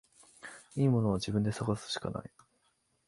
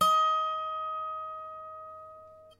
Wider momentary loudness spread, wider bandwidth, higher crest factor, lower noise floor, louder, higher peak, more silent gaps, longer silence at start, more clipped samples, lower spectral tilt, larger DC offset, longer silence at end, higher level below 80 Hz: about the same, 20 LU vs 22 LU; second, 11.5 kHz vs 16 kHz; about the same, 18 dB vs 18 dB; first, -75 dBFS vs -51 dBFS; second, -33 LUFS vs -30 LUFS; about the same, -16 dBFS vs -14 dBFS; neither; first, 0.45 s vs 0 s; neither; first, -6.5 dB/octave vs -2 dB/octave; neither; first, 0.8 s vs 0.05 s; first, -58 dBFS vs -74 dBFS